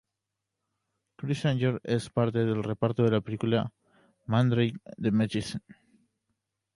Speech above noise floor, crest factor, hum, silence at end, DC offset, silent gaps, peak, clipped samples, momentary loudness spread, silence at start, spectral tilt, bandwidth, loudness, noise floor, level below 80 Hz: 58 dB; 20 dB; none; 1.05 s; under 0.1%; none; -10 dBFS; under 0.1%; 11 LU; 1.2 s; -7.5 dB/octave; 11.5 kHz; -28 LUFS; -86 dBFS; -60 dBFS